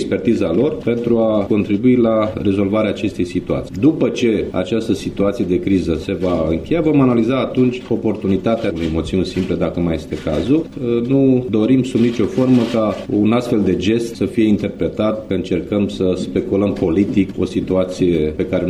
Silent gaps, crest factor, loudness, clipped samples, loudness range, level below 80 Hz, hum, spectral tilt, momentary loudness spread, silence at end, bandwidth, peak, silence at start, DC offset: none; 14 dB; -17 LUFS; under 0.1%; 2 LU; -40 dBFS; none; -7.5 dB/octave; 6 LU; 0 s; 12 kHz; -2 dBFS; 0 s; under 0.1%